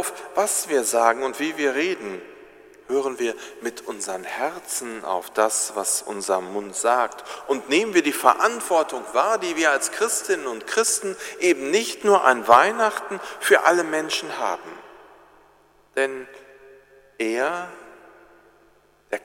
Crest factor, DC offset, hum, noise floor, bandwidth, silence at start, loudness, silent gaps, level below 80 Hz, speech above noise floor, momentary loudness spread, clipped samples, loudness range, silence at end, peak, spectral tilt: 24 dB; under 0.1%; 50 Hz at -70 dBFS; -58 dBFS; 16.5 kHz; 0 s; -22 LUFS; none; -70 dBFS; 35 dB; 14 LU; under 0.1%; 11 LU; 0.05 s; 0 dBFS; -1.5 dB/octave